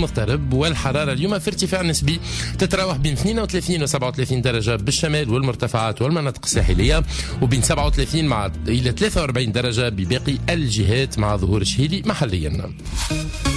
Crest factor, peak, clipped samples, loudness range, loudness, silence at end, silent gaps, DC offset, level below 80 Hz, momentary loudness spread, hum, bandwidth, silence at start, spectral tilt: 14 dB; -6 dBFS; under 0.1%; 1 LU; -20 LUFS; 0 s; none; under 0.1%; -28 dBFS; 4 LU; none; 11 kHz; 0 s; -5 dB/octave